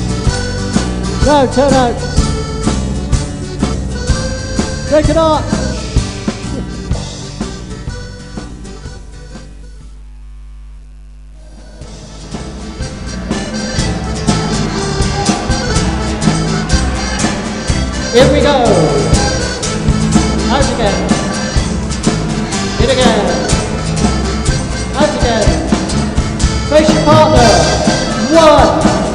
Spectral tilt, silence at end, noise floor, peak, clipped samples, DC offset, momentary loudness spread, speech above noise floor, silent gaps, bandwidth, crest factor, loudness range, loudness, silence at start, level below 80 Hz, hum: -5 dB/octave; 0 s; -33 dBFS; 0 dBFS; 0.2%; 0.4%; 16 LU; 25 dB; none; 11.5 kHz; 14 dB; 18 LU; -13 LUFS; 0 s; -22 dBFS; none